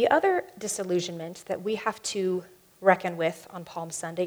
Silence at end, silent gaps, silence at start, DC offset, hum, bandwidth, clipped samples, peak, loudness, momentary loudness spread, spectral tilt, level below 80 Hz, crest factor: 0 s; none; 0 s; under 0.1%; none; over 20 kHz; under 0.1%; -4 dBFS; -28 LUFS; 12 LU; -4 dB/octave; -72 dBFS; 22 dB